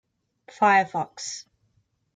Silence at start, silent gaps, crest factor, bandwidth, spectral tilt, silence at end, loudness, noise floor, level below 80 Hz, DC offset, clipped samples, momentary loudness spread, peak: 0.6 s; none; 20 dB; 9.4 kHz; -3 dB/octave; 0.75 s; -23 LUFS; -69 dBFS; -74 dBFS; under 0.1%; under 0.1%; 15 LU; -8 dBFS